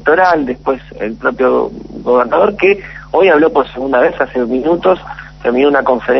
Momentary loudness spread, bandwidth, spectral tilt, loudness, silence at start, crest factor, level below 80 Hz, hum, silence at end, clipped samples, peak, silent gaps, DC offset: 9 LU; 6.2 kHz; -7 dB/octave; -13 LUFS; 0 s; 12 dB; -40 dBFS; none; 0 s; under 0.1%; 0 dBFS; none; under 0.1%